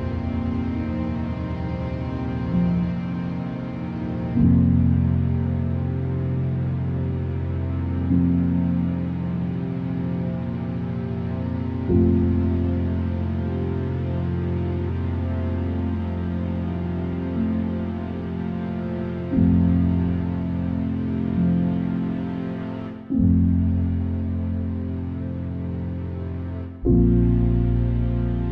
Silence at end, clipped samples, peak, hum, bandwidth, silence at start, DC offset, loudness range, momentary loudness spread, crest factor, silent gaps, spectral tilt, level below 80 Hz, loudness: 0 s; under 0.1%; -8 dBFS; none; 4.8 kHz; 0 s; under 0.1%; 4 LU; 9 LU; 14 dB; none; -11 dB/octave; -34 dBFS; -24 LUFS